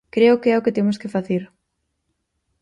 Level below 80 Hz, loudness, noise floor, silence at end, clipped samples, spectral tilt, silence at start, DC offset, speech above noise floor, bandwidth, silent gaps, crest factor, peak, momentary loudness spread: -62 dBFS; -19 LUFS; -74 dBFS; 1.15 s; under 0.1%; -7.5 dB/octave; 0.15 s; under 0.1%; 56 dB; 10.5 kHz; none; 16 dB; -4 dBFS; 10 LU